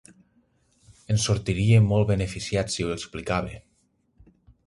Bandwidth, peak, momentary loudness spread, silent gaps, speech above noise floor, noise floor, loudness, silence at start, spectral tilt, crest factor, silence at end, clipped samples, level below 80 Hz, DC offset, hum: 11.5 kHz; -8 dBFS; 11 LU; none; 45 dB; -68 dBFS; -24 LUFS; 1.1 s; -5.5 dB/octave; 18 dB; 1.1 s; under 0.1%; -44 dBFS; under 0.1%; none